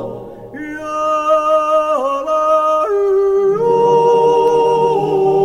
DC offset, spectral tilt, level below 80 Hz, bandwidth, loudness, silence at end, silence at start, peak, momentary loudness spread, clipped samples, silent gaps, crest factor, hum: under 0.1%; -6 dB/octave; -50 dBFS; 11.5 kHz; -14 LUFS; 0 s; 0 s; -2 dBFS; 14 LU; under 0.1%; none; 12 dB; 50 Hz at -55 dBFS